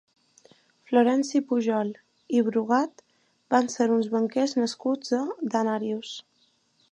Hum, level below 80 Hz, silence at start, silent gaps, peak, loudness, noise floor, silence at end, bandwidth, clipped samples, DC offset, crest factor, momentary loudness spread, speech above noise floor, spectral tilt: none; -82 dBFS; 0.9 s; none; -8 dBFS; -26 LUFS; -67 dBFS; 0.7 s; 9.8 kHz; under 0.1%; under 0.1%; 20 dB; 10 LU; 43 dB; -5 dB/octave